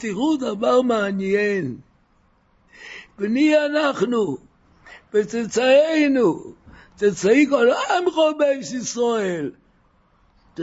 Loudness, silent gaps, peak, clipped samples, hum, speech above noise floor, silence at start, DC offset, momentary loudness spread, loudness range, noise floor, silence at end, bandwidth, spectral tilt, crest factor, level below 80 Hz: -20 LUFS; none; -4 dBFS; under 0.1%; none; 41 dB; 0 s; under 0.1%; 15 LU; 5 LU; -60 dBFS; 0 s; 8 kHz; -4.5 dB/octave; 16 dB; -60 dBFS